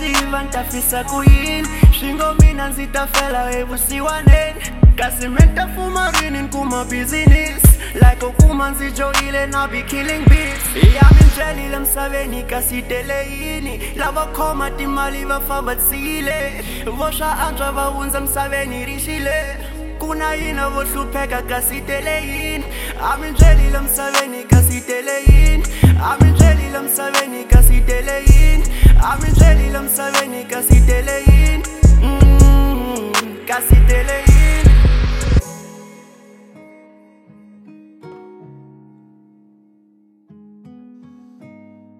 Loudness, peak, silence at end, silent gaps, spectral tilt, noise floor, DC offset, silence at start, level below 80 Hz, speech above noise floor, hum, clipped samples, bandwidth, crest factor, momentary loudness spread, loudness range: -15 LUFS; 0 dBFS; 0.5 s; none; -5 dB/octave; -53 dBFS; under 0.1%; 0 s; -16 dBFS; 40 dB; none; under 0.1%; 16.5 kHz; 14 dB; 10 LU; 7 LU